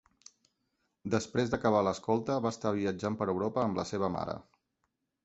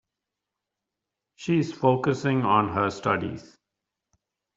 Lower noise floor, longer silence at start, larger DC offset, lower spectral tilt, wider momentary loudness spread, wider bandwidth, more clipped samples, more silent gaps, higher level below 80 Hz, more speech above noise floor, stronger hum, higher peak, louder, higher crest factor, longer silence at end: second, -82 dBFS vs -86 dBFS; second, 1.05 s vs 1.4 s; neither; about the same, -6 dB/octave vs -7 dB/octave; second, 7 LU vs 12 LU; about the same, 8.2 kHz vs 7.8 kHz; neither; neither; about the same, -60 dBFS vs -64 dBFS; second, 50 dB vs 62 dB; neither; second, -12 dBFS vs -6 dBFS; second, -32 LUFS vs -25 LUFS; about the same, 20 dB vs 22 dB; second, 0.85 s vs 1.1 s